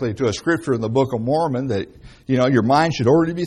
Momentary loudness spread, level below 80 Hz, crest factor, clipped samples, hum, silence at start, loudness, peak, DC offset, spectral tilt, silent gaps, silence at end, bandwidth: 9 LU; -48 dBFS; 16 dB; under 0.1%; none; 0 s; -19 LUFS; -4 dBFS; under 0.1%; -6.5 dB/octave; none; 0 s; 11.5 kHz